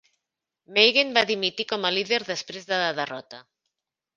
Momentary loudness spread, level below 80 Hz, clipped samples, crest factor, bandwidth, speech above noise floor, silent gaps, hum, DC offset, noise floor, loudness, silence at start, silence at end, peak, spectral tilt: 14 LU; -72 dBFS; under 0.1%; 24 dB; 7.4 kHz; 60 dB; none; none; under 0.1%; -85 dBFS; -23 LUFS; 0.7 s; 0.75 s; -2 dBFS; -2.5 dB/octave